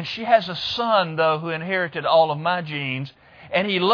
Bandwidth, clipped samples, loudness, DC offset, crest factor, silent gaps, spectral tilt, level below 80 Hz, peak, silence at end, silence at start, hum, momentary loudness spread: 5.4 kHz; under 0.1%; -21 LUFS; under 0.1%; 20 dB; none; -6 dB/octave; -64 dBFS; -2 dBFS; 0 s; 0 s; none; 8 LU